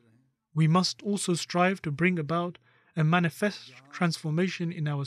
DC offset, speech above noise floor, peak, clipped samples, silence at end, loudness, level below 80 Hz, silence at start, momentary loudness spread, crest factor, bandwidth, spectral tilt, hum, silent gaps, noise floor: under 0.1%; 39 dB; -12 dBFS; under 0.1%; 0 s; -28 LUFS; -72 dBFS; 0.55 s; 10 LU; 16 dB; 13.5 kHz; -5.5 dB/octave; none; none; -66 dBFS